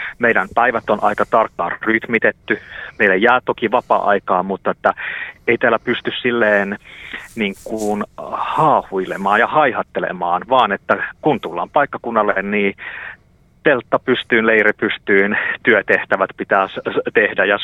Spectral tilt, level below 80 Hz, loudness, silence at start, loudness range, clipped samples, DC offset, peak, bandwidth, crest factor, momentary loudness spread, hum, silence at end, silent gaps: -5.5 dB/octave; -52 dBFS; -17 LUFS; 0 s; 3 LU; under 0.1%; under 0.1%; 0 dBFS; 14 kHz; 18 dB; 9 LU; none; 0 s; none